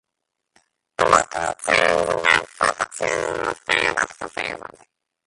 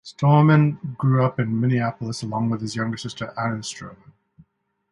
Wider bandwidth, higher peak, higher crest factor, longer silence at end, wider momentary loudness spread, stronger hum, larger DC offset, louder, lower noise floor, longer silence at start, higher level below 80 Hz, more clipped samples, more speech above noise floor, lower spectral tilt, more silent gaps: about the same, 11.5 kHz vs 11 kHz; first, 0 dBFS vs -4 dBFS; about the same, 22 dB vs 18 dB; second, 0.65 s vs 0.95 s; second, 11 LU vs 14 LU; neither; neither; about the same, -20 LUFS vs -22 LUFS; first, -80 dBFS vs -64 dBFS; first, 1 s vs 0.05 s; first, -52 dBFS vs -58 dBFS; neither; first, 59 dB vs 43 dB; second, -2 dB/octave vs -7 dB/octave; neither